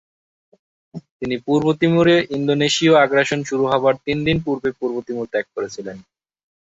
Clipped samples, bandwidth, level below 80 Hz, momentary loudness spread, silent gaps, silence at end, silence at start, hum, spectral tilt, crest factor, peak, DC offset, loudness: under 0.1%; 8 kHz; -52 dBFS; 16 LU; 1.10-1.20 s; 0.65 s; 0.95 s; none; -5 dB/octave; 18 dB; -2 dBFS; under 0.1%; -18 LUFS